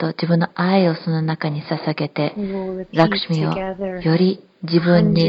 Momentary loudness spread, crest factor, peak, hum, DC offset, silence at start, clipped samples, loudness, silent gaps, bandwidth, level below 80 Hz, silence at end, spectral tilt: 8 LU; 18 dB; 0 dBFS; none; under 0.1%; 0 s; under 0.1%; -20 LUFS; none; 6.2 kHz; -50 dBFS; 0 s; -8.5 dB/octave